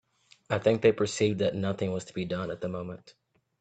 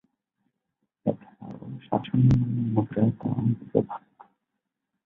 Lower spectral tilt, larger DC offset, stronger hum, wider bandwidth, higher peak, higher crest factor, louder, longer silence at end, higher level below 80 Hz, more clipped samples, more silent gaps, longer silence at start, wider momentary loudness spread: second, -5.5 dB/octave vs -10.5 dB/octave; neither; neither; first, 9.2 kHz vs 4.9 kHz; about the same, -8 dBFS vs -6 dBFS; about the same, 20 dB vs 22 dB; second, -29 LUFS vs -26 LUFS; second, 0.5 s vs 1.1 s; second, -64 dBFS vs -48 dBFS; neither; neither; second, 0.5 s vs 1.05 s; second, 12 LU vs 19 LU